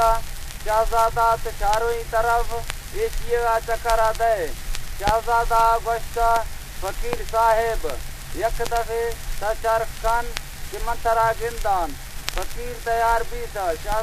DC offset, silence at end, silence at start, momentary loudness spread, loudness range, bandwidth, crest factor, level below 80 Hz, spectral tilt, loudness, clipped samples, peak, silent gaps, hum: under 0.1%; 0 s; 0 s; 12 LU; 3 LU; 15.5 kHz; 22 dB; -30 dBFS; -3.5 dB/octave; -23 LUFS; under 0.1%; 0 dBFS; none; none